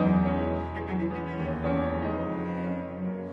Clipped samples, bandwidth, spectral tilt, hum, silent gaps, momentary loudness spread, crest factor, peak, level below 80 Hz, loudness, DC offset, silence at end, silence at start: under 0.1%; 4.9 kHz; -10 dB/octave; none; none; 7 LU; 16 dB; -14 dBFS; -44 dBFS; -30 LUFS; under 0.1%; 0 s; 0 s